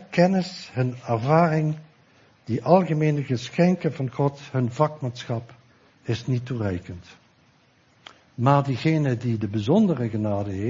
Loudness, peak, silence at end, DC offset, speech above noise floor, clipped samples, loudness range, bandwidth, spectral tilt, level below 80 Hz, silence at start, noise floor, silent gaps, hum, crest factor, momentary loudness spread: -24 LUFS; -4 dBFS; 0 s; under 0.1%; 37 dB; under 0.1%; 7 LU; 7.6 kHz; -8 dB/octave; -60 dBFS; 0 s; -60 dBFS; none; none; 20 dB; 12 LU